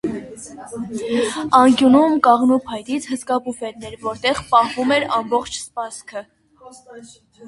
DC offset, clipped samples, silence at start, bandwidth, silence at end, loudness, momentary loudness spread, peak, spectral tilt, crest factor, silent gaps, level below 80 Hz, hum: under 0.1%; under 0.1%; 0.05 s; 11.5 kHz; 0 s; -18 LUFS; 18 LU; 0 dBFS; -4 dB/octave; 18 dB; none; -54 dBFS; none